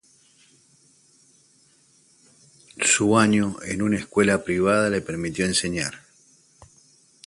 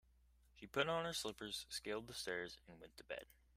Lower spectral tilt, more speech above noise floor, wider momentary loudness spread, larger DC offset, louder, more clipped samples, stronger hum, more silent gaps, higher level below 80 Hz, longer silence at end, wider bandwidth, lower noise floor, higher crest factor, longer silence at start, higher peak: about the same, -4 dB/octave vs -3 dB/octave; first, 37 dB vs 26 dB; second, 9 LU vs 19 LU; neither; first, -22 LUFS vs -45 LUFS; neither; neither; neither; first, -54 dBFS vs -70 dBFS; first, 1.3 s vs 0.3 s; second, 11.5 kHz vs 15.5 kHz; second, -59 dBFS vs -72 dBFS; second, 20 dB vs 26 dB; first, 2.8 s vs 0.55 s; first, -4 dBFS vs -22 dBFS